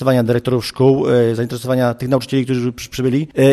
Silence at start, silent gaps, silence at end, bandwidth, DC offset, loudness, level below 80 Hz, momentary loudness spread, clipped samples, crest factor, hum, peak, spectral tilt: 0 s; none; 0 s; 13.5 kHz; under 0.1%; -17 LUFS; -48 dBFS; 6 LU; under 0.1%; 12 dB; none; -2 dBFS; -7 dB/octave